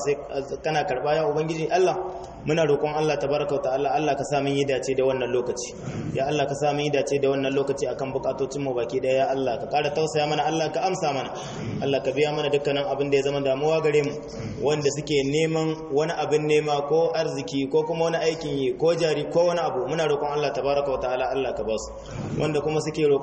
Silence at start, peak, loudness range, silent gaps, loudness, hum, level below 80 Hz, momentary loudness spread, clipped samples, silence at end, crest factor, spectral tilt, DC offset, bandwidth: 0 s; -10 dBFS; 2 LU; none; -24 LUFS; none; -52 dBFS; 7 LU; under 0.1%; 0 s; 14 dB; -5 dB/octave; under 0.1%; 8.8 kHz